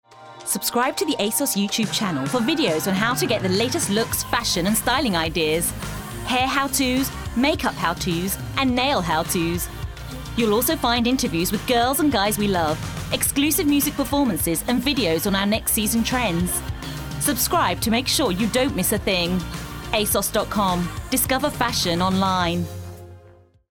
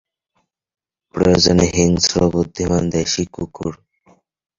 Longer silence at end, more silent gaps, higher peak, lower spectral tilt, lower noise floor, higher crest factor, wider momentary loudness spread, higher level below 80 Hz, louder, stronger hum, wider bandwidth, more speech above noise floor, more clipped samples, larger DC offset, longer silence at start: second, 0.45 s vs 0.85 s; neither; second, -4 dBFS vs 0 dBFS; about the same, -3.5 dB/octave vs -4.5 dB/octave; second, -50 dBFS vs -69 dBFS; about the same, 18 dB vs 18 dB; second, 7 LU vs 14 LU; about the same, -38 dBFS vs -36 dBFS; second, -21 LUFS vs -16 LUFS; neither; first, 19.5 kHz vs 7.6 kHz; second, 29 dB vs 53 dB; neither; neither; second, 0.1 s vs 1.15 s